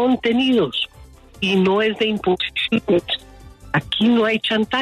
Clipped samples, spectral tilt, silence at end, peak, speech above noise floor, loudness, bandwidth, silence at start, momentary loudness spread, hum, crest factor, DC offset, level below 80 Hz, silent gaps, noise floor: under 0.1%; -6 dB/octave; 0 s; -6 dBFS; 26 dB; -19 LUFS; 12.5 kHz; 0 s; 8 LU; none; 12 dB; under 0.1%; -48 dBFS; none; -44 dBFS